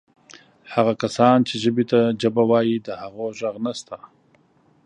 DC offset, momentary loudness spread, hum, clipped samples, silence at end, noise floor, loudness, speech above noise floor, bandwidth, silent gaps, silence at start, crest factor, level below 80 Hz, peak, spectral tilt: under 0.1%; 15 LU; none; under 0.1%; 0.9 s; -59 dBFS; -20 LUFS; 39 dB; 10 kHz; none; 0.7 s; 20 dB; -64 dBFS; -2 dBFS; -6 dB/octave